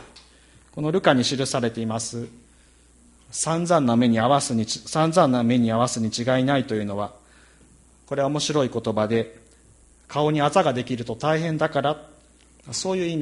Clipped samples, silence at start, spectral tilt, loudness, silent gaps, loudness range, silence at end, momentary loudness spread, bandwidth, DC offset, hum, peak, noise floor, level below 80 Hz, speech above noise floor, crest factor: under 0.1%; 0 s; -5 dB/octave; -23 LUFS; none; 5 LU; 0 s; 12 LU; 11.5 kHz; under 0.1%; none; -4 dBFS; -54 dBFS; -56 dBFS; 32 dB; 20 dB